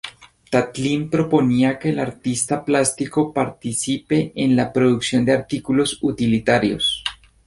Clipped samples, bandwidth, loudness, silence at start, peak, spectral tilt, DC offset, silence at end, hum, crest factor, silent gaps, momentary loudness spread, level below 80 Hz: under 0.1%; 11.5 kHz; -20 LUFS; 0.05 s; -2 dBFS; -4.5 dB/octave; under 0.1%; 0.35 s; none; 18 dB; none; 6 LU; -50 dBFS